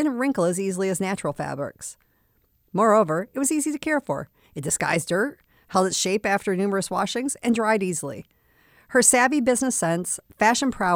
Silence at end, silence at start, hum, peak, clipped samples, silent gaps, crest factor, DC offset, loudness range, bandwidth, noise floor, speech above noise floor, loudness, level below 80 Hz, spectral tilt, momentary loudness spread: 0 s; 0 s; none; -4 dBFS; under 0.1%; none; 20 dB; under 0.1%; 3 LU; 20 kHz; -65 dBFS; 42 dB; -23 LUFS; -60 dBFS; -3.5 dB/octave; 12 LU